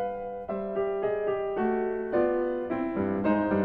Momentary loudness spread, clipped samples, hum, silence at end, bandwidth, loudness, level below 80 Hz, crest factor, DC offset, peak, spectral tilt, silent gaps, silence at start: 7 LU; under 0.1%; none; 0 s; 4.5 kHz; -29 LUFS; -54 dBFS; 14 dB; under 0.1%; -14 dBFS; -10.5 dB/octave; none; 0 s